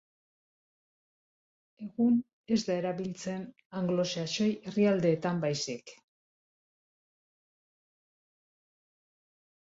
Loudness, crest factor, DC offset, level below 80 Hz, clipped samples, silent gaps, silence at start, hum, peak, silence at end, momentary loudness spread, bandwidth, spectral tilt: -31 LUFS; 18 dB; under 0.1%; -72 dBFS; under 0.1%; 2.33-2.44 s, 3.65-3.70 s; 1.8 s; none; -16 dBFS; 3.7 s; 13 LU; 8 kHz; -5.5 dB/octave